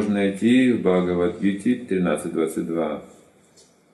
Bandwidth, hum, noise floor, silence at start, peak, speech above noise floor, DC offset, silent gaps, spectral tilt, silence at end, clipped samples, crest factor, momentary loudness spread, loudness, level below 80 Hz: 12.5 kHz; none; -55 dBFS; 0 s; -6 dBFS; 34 dB; under 0.1%; none; -6.5 dB/octave; 0.9 s; under 0.1%; 16 dB; 8 LU; -22 LUFS; -64 dBFS